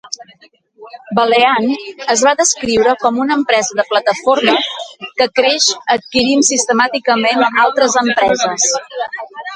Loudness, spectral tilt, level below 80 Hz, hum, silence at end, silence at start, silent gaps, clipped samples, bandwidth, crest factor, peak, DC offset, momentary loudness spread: -13 LUFS; -1.5 dB/octave; -54 dBFS; none; 0 s; 0.05 s; none; under 0.1%; 11 kHz; 14 dB; 0 dBFS; under 0.1%; 10 LU